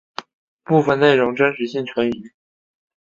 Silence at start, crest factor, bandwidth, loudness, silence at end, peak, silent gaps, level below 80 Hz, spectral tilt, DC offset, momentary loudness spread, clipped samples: 0.2 s; 18 dB; 7.6 kHz; -18 LUFS; 0.8 s; -2 dBFS; 0.33-0.59 s; -60 dBFS; -7 dB/octave; under 0.1%; 18 LU; under 0.1%